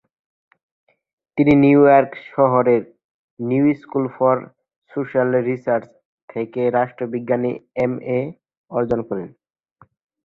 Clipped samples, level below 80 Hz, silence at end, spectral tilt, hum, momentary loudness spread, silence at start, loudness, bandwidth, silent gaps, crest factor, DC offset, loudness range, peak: under 0.1%; -56 dBFS; 1 s; -10 dB/octave; none; 16 LU; 1.35 s; -19 LUFS; 4.4 kHz; 3.04-3.37 s, 4.76-4.82 s, 6.05-6.28 s, 8.57-8.64 s; 18 dB; under 0.1%; 7 LU; -2 dBFS